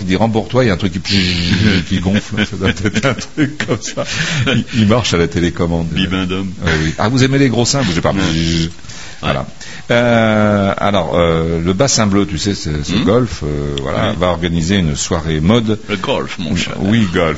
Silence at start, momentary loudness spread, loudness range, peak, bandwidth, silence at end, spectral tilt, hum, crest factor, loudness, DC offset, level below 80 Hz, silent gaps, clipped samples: 0 s; 7 LU; 2 LU; 0 dBFS; 8 kHz; 0 s; -5 dB/octave; none; 14 dB; -15 LUFS; 3%; -32 dBFS; none; under 0.1%